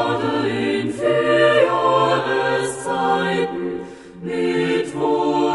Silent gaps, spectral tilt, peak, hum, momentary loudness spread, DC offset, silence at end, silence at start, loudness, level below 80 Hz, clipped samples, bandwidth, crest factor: none; -5 dB/octave; -4 dBFS; none; 11 LU; under 0.1%; 0 s; 0 s; -19 LUFS; -56 dBFS; under 0.1%; 11.5 kHz; 16 dB